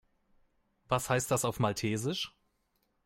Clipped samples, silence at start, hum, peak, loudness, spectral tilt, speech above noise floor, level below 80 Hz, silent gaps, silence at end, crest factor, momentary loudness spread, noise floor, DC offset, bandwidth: under 0.1%; 0.9 s; none; -14 dBFS; -32 LUFS; -4.5 dB/octave; 45 dB; -62 dBFS; none; 0.75 s; 20 dB; 6 LU; -77 dBFS; under 0.1%; 16.5 kHz